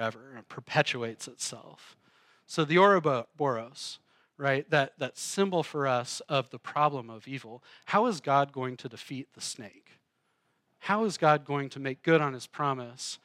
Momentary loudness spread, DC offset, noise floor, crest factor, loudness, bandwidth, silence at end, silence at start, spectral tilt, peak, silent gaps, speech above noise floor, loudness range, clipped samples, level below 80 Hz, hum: 16 LU; under 0.1%; -76 dBFS; 22 dB; -29 LUFS; 15.5 kHz; 0.1 s; 0 s; -4.5 dB/octave; -10 dBFS; none; 46 dB; 4 LU; under 0.1%; -88 dBFS; none